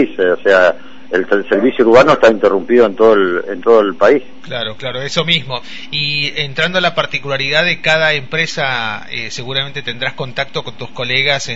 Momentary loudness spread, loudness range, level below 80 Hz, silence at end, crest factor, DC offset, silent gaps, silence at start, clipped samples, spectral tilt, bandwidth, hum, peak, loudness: 12 LU; 6 LU; -50 dBFS; 0 s; 14 dB; 4%; none; 0 s; under 0.1%; -4.5 dB/octave; 8 kHz; none; 0 dBFS; -13 LUFS